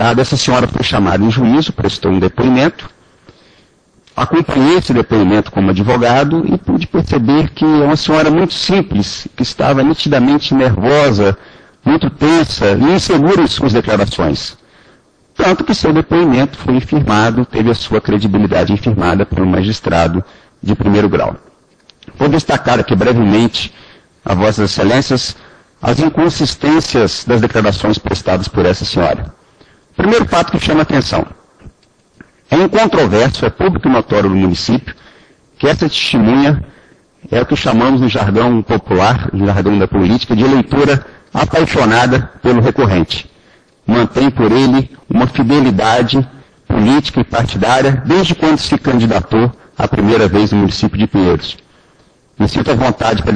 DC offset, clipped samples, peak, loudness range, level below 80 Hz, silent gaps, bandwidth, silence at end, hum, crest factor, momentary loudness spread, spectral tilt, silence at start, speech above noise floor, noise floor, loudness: under 0.1%; under 0.1%; 0 dBFS; 3 LU; -34 dBFS; none; 10.5 kHz; 0 s; none; 12 dB; 6 LU; -6 dB/octave; 0 s; 40 dB; -51 dBFS; -12 LUFS